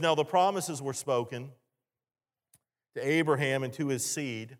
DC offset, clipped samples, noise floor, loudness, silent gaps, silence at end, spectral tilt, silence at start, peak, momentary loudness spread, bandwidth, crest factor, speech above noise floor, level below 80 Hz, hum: under 0.1%; under 0.1%; under -90 dBFS; -30 LUFS; none; 0.05 s; -4 dB/octave; 0 s; -12 dBFS; 13 LU; 17 kHz; 18 dB; over 60 dB; -80 dBFS; none